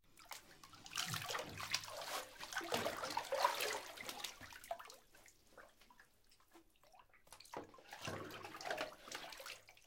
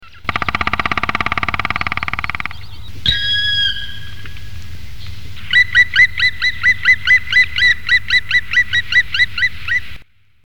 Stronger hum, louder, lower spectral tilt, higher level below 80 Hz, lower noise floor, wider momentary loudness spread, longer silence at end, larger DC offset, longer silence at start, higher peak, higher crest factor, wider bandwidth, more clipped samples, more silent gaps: neither; second, -45 LUFS vs -14 LUFS; about the same, -2 dB/octave vs -2.5 dB/octave; second, -74 dBFS vs -36 dBFS; first, -72 dBFS vs -37 dBFS; second, 20 LU vs 23 LU; about the same, 0.05 s vs 0 s; second, under 0.1% vs 7%; about the same, 0.05 s vs 0 s; second, -20 dBFS vs -2 dBFS; first, 28 dB vs 16 dB; second, 17 kHz vs 19 kHz; neither; neither